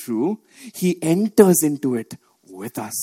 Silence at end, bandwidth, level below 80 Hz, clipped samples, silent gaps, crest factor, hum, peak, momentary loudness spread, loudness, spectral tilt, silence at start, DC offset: 0 s; 17 kHz; -66 dBFS; under 0.1%; none; 20 dB; none; 0 dBFS; 20 LU; -19 LUFS; -5.5 dB/octave; 0 s; under 0.1%